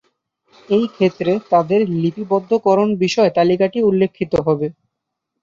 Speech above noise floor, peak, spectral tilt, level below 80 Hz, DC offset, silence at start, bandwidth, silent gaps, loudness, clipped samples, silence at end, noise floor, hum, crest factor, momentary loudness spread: 62 dB; -2 dBFS; -7 dB/octave; -52 dBFS; under 0.1%; 0.7 s; 7.6 kHz; none; -17 LUFS; under 0.1%; 0.7 s; -78 dBFS; none; 14 dB; 5 LU